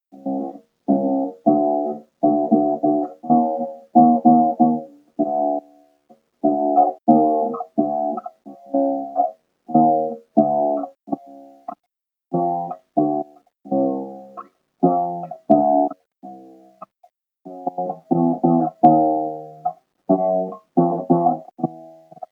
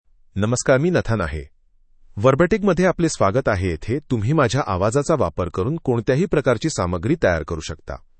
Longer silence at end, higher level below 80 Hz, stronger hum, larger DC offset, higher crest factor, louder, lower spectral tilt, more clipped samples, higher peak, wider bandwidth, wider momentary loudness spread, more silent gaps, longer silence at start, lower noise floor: second, 0.05 s vs 0.2 s; second, -84 dBFS vs -40 dBFS; neither; neither; about the same, 20 dB vs 18 dB; about the same, -20 LUFS vs -20 LUFS; first, -12.5 dB/octave vs -6 dB/octave; neither; about the same, 0 dBFS vs -2 dBFS; second, 2.2 kHz vs 8.8 kHz; first, 16 LU vs 10 LU; neither; second, 0.15 s vs 0.35 s; first, -79 dBFS vs -53 dBFS